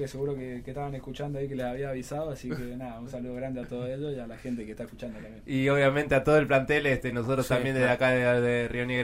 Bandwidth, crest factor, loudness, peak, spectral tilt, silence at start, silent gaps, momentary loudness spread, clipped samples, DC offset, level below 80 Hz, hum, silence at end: 16 kHz; 18 dB; -28 LUFS; -10 dBFS; -6.5 dB/octave; 0 s; none; 15 LU; under 0.1%; under 0.1%; -48 dBFS; none; 0 s